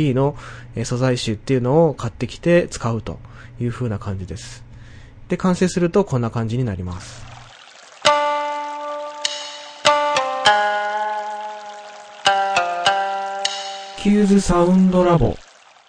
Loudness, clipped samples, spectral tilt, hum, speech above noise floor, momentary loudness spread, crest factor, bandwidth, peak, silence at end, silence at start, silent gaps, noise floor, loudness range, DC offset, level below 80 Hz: -19 LUFS; under 0.1%; -5 dB/octave; none; 25 dB; 18 LU; 20 dB; 10 kHz; 0 dBFS; 0.45 s; 0 s; none; -44 dBFS; 6 LU; under 0.1%; -40 dBFS